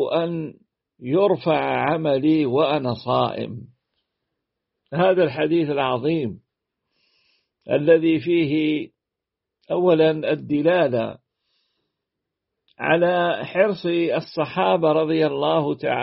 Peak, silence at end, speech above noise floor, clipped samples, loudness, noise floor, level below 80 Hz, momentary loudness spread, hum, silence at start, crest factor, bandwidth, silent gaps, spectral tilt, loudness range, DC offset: -4 dBFS; 0 s; 65 dB; under 0.1%; -21 LUFS; -85 dBFS; -64 dBFS; 10 LU; none; 0 s; 18 dB; 5.8 kHz; none; -5 dB/octave; 3 LU; under 0.1%